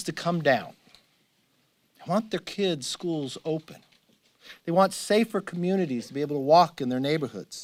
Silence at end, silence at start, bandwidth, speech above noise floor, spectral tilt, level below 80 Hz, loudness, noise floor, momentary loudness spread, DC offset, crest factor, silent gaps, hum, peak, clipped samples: 0 s; 0 s; 16.5 kHz; 42 dB; -5 dB/octave; -70 dBFS; -26 LUFS; -69 dBFS; 12 LU; under 0.1%; 22 dB; none; none; -6 dBFS; under 0.1%